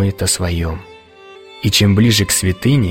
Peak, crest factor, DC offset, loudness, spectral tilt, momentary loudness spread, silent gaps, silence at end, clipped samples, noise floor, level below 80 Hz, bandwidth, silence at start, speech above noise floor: -2 dBFS; 14 dB; under 0.1%; -14 LUFS; -4.5 dB/octave; 11 LU; none; 0 s; under 0.1%; -40 dBFS; -34 dBFS; 16.5 kHz; 0 s; 26 dB